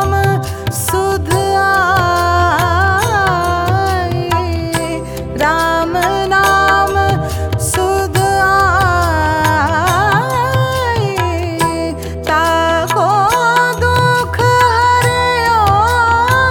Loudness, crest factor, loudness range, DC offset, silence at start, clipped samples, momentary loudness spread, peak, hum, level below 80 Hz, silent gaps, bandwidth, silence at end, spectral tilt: -13 LUFS; 12 dB; 3 LU; under 0.1%; 0 s; under 0.1%; 6 LU; 0 dBFS; none; -30 dBFS; none; 19.5 kHz; 0 s; -4.5 dB/octave